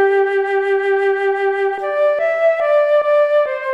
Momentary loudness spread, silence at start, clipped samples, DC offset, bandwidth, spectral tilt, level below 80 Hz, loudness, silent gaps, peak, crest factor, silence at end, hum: 3 LU; 0 s; under 0.1%; under 0.1%; 7.4 kHz; -3.5 dB/octave; -68 dBFS; -16 LUFS; none; -6 dBFS; 10 dB; 0 s; none